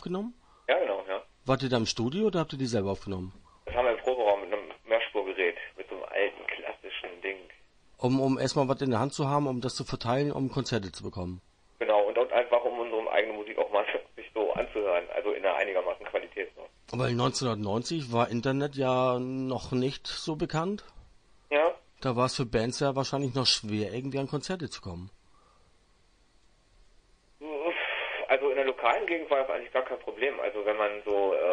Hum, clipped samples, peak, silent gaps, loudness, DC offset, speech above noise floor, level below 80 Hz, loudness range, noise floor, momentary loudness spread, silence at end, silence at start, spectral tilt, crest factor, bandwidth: none; under 0.1%; -8 dBFS; none; -30 LUFS; under 0.1%; 34 dB; -58 dBFS; 4 LU; -64 dBFS; 11 LU; 0 s; 0 s; -5 dB/octave; 22 dB; 10.5 kHz